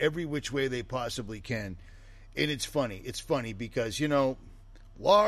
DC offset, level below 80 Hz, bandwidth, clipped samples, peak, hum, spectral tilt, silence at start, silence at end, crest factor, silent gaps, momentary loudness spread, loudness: under 0.1%; -50 dBFS; 13 kHz; under 0.1%; -10 dBFS; none; -4.5 dB/octave; 0 s; 0 s; 20 dB; none; 11 LU; -32 LUFS